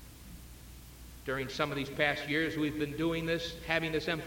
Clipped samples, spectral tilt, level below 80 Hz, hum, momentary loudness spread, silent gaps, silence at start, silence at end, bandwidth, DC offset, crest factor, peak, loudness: under 0.1%; -5 dB/octave; -52 dBFS; none; 20 LU; none; 0 s; 0 s; 17 kHz; under 0.1%; 20 dB; -14 dBFS; -33 LUFS